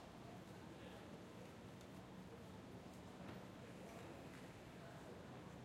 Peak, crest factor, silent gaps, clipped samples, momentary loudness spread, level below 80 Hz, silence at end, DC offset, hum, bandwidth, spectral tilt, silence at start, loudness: -42 dBFS; 16 dB; none; under 0.1%; 2 LU; -74 dBFS; 0 s; under 0.1%; none; 16 kHz; -5.5 dB/octave; 0 s; -57 LUFS